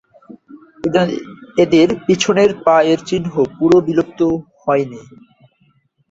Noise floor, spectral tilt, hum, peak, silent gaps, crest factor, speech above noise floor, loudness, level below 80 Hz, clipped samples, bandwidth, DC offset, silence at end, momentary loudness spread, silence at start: -58 dBFS; -5.5 dB/octave; none; 0 dBFS; none; 16 dB; 44 dB; -15 LUFS; -52 dBFS; under 0.1%; 8 kHz; under 0.1%; 1.1 s; 9 LU; 0.3 s